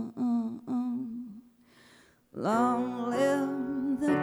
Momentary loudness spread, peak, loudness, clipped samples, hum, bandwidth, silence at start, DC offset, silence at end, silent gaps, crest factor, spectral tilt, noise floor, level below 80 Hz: 12 LU; -14 dBFS; -30 LUFS; under 0.1%; none; 13 kHz; 0 s; under 0.1%; 0 s; none; 16 dB; -6.5 dB/octave; -60 dBFS; -68 dBFS